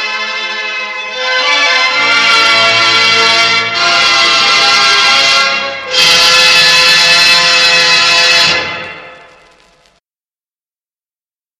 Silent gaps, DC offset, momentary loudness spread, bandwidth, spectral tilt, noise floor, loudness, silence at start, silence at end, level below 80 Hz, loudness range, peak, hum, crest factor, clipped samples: none; under 0.1%; 11 LU; over 20 kHz; 0.5 dB/octave; under -90 dBFS; -6 LUFS; 0 s; 2.45 s; -52 dBFS; 5 LU; 0 dBFS; none; 10 dB; 0.3%